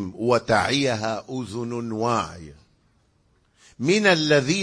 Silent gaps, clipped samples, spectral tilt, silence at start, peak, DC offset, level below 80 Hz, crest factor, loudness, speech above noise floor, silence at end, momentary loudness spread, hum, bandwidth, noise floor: none; under 0.1%; -4.5 dB/octave; 0 s; -4 dBFS; under 0.1%; -56 dBFS; 20 dB; -22 LUFS; 41 dB; 0 s; 12 LU; none; 10.5 kHz; -64 dBFS